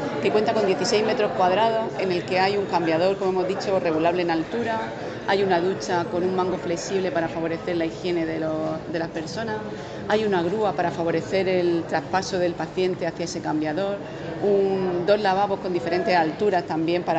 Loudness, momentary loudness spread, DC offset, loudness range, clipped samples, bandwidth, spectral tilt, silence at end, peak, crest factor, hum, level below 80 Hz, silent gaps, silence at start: -24 LUFS; 7 LU; under 0.1%; 4 LU; under 0.1%; 8.8 kHz; -5.5 dB/octave; 0 s; -6 dBFS; 18 dB; none; -56 dBFS; none; 0 s